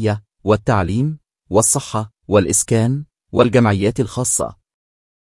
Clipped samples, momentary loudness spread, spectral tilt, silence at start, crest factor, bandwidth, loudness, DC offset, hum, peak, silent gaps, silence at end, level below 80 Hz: under 0.1%; 10 LU; -5 dB/octave; 0 s; 18 dB; 12 kHz; -17 LUFS; under 0.1%; none; 0 dBFS; none; 0.8 s; -46 dBFS